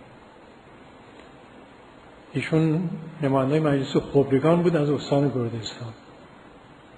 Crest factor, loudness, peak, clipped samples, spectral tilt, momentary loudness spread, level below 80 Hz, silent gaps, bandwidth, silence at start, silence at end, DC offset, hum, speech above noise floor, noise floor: 18 dB; -23 LUFS; -6 dBFS; under 0.1%; -7.5 dB/octave; 13 LU; -56 dBFS; none; 10.5 kHz; 0 s; 0.4 s; under 0.1%; none; 26 dB; -49 dBFS